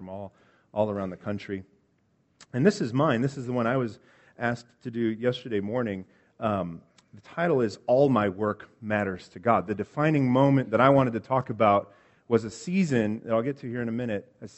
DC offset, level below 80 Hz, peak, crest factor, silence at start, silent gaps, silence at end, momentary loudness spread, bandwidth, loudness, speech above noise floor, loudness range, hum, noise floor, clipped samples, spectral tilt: under 0.1%; -64 dBFS; -4 dBFS; 22 dB; 0 s; none; 0.1 s; 14 LU; 8.2 kHz; -26 LUFS; 42 dB; 6 LU; none; -68 dBFS; under 0.1%; -7.5 dB/octave